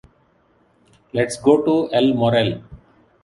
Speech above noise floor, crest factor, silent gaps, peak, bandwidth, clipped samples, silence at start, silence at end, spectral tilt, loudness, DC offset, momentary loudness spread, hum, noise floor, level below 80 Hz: 42 dB; 18 dB; none; -2 dBFS; 11.5 kHz; under 0.1%; 1.15 s; 0.45 s; -6 dB/octave; -18 LUFS; under 0.1%; 9 LU; none; -59 dBFS; -52 dBFS